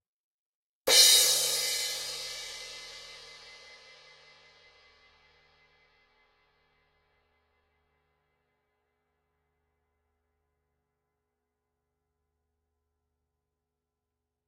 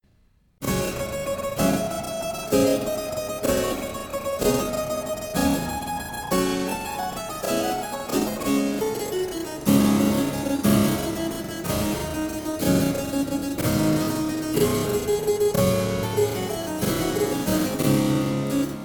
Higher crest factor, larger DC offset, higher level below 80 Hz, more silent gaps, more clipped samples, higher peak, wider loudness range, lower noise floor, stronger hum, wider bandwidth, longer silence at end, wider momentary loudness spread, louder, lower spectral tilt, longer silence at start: first, 28 dB vs 18 dB; neither; second, -72 dBFS vs -44 dBFS; neither; neither; about the same, -6 dBFS vs -6 dBFS; first, 24 LU vs 3 LU; first, -87 dBFS vs -60 dBFS; neither; second, 16 kHz vs 19 kHz; first, 11.2 s vs 0 s; first, 27 LU vs 8 LU; about the same, -23 LUFS vs -24 LUFS; second, 2.5 dB/octave vs -5 dB/octave; first, 0.85 s vs 0.6 s